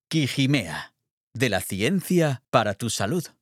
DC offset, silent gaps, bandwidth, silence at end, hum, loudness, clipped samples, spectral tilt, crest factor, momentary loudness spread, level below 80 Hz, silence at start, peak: under 0.1%; 1.11-1.31 s; 16.5 kHz; 0.15 s; none; -24 LUFS; under 0.1%; -5 dB/octave; 22 dB; 11 LU; -64 dBFS; 0.1 s; -4 dBFS